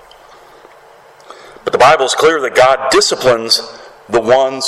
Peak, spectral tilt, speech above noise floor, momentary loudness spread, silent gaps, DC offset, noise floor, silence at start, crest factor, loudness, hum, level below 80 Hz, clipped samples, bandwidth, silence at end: 0 dBFS; -2.5 dB/octave; 30 dB; 9 LU; none; under 0.1%; -42 dBFS; 1.65 s; 14 dB; -11 LUFS; none; -48 dBFS; under 0.1%; 14.5 kHz; 0 s